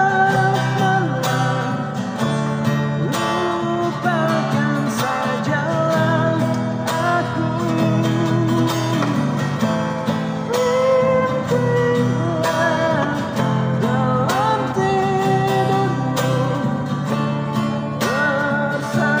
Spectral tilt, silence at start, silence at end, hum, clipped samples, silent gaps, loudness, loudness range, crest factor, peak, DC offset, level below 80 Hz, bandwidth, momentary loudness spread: -6 dB/octave; 0 s; 0 s; none; under 0.1%; none; -19 LUFS; 2 LU; 12 dB; -6 dBFS; under 0.1%; -52 dBFS; 16 kHz; 4 LU